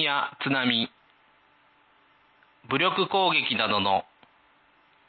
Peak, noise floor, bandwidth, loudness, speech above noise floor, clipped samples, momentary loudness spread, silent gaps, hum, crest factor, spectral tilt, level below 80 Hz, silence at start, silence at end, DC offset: -10 dBFS; -62 dBFS; 4.7 kHz; -25 LUFS; 37 dB; under 0.1%; 6 LU; none; none; 20 dB; -8.5 dB/octave; -66 dBFS; 0 s; 1.05 s; under 0.1%